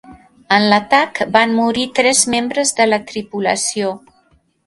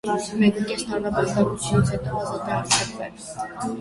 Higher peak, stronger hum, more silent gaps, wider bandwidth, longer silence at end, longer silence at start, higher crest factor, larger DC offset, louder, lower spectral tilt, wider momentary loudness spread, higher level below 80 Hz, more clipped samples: first, 0 dBFS vs -4 dBFS; neither; neither; about the same, 11.5 kHz vs 11.5 kHz; first, 0.7 s vs 0 s; about the same, 0.1 s vs 0.05 s; about the same, 16 dB vs 18 dB; neither; first, -15 LUFS vs -23 LUFS; second, -2.5 dB/octave vs -4.5 dB/octave; second, 8 LU vs 11 LU; second, -56 dBFS vs -46 dBFS; neither